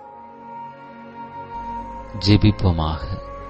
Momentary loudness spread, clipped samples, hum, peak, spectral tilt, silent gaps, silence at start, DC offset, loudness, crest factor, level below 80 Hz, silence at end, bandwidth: 23 LU; under 0.1%; none; -2 dBFS; -7.5 dB/octave; none; 0 s; under 0.1%; -21 LUFS; 20 dB; -34 dBFS; 0 s; 8 kHz